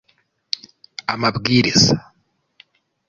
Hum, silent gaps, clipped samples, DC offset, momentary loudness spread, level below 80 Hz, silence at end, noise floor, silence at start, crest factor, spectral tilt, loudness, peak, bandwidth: none; none; under 0.1%; under 0.1%; 15 LU; -48 dBFS; 1.1 s; -65 dBFS; 1.1 s; 20 dB; -4 dB/octave; -18 LUFS; -2 dBFS; 7.6 kHz